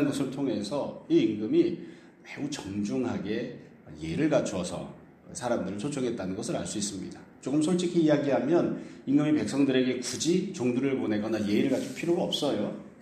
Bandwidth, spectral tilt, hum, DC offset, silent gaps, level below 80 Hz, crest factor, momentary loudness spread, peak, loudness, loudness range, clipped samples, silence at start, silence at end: 13.5 kHz; -5.5 dB/octave; none; under 0.1%; none; -64 dBFS; 16 dB; 14 LU; -12 dBFS; -28 LUFS; 6 LU; under 0.1%; 0 s; 0 s